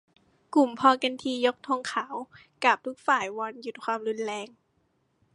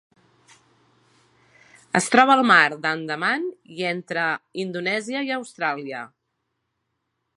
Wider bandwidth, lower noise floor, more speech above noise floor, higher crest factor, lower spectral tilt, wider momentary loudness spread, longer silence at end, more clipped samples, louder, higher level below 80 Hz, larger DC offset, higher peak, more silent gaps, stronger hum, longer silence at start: about the same, 11.5 kHz vs 11.5 kHz; second, -71 dBFS vs -76 dBFS; second, 44 dB vs 55 dB; about the same, 22 dB vs 24 dB; about the same, -3 dB/octave vs -3.5 dB/octave; about the same, 15 LU vs 15 LU; second, 0.9 s vs 1.3 s; neither; second, -27 LUFS vs -21 LUFS; about the same, -76 dBFS vs -76 dBFS; neither; second, -6 dBFS vs 0 dBFS; neither; neither; second, 0.5 s vs 1.95 s